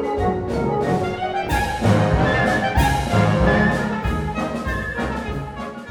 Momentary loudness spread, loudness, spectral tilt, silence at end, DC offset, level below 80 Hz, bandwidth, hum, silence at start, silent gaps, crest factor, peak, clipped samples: 8 LU; -20 LUFS; -6.5 dB/octave; 0 s; under 0.1%; -30 dBFS; 19.5 kHz; none; 0 s; none; 16 dB; -4 dBFS; under 0.1%